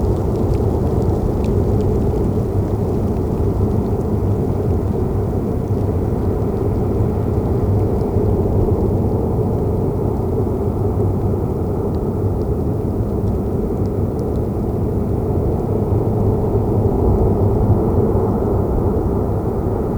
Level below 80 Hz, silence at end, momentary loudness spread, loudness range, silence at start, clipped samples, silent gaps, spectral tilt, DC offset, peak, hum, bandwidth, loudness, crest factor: -24 dBFS; 0 s; 4 LU; 3 LU; 0 s; under 0.1%; none; -10.5 dB/octave; under 0.1%; -4 dBFS; none; over 20 kHz; -18 LUFS; 14 dB